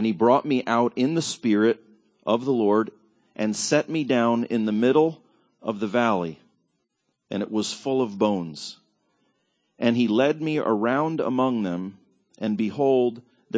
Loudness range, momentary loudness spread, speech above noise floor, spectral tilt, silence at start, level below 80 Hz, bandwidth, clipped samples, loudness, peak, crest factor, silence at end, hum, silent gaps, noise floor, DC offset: 5 LU; 12 LU; 53 dB; -5.5 dB/octave; 0 s; -68 dBFS; 8 kHz; under 0.1%; -24 LUFS; -6 dBFS; 18 dB; 0 s; none; none; -76 dBFS; under 0.1%